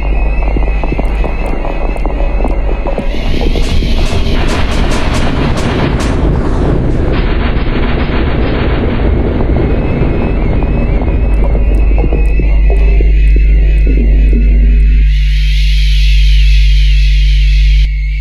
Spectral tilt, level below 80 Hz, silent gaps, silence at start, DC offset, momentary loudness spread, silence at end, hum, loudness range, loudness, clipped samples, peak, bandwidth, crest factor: -7 dB/octave; -10 dBFS; none; 0 s; 0.5%; 6 LU; 0 s; none; 5 LU; -12 LUFS; under 0.1%; 0 dBFS; 8 kHz; 8 dB